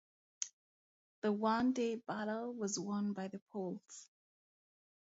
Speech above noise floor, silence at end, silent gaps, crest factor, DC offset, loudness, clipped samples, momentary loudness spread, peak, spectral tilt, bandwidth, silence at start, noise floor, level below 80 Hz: over 52 dB; 1.1 s; 0.53-1.22 s, 3.42-3.47 s; 22 dB; under 0.1%; -39 LUFS; under 0.1%; 11 LU; -18 dBFS; -5 dB/octave; 7.6 kHz; 0.4 s; under -90 dBFS; -80 dBFS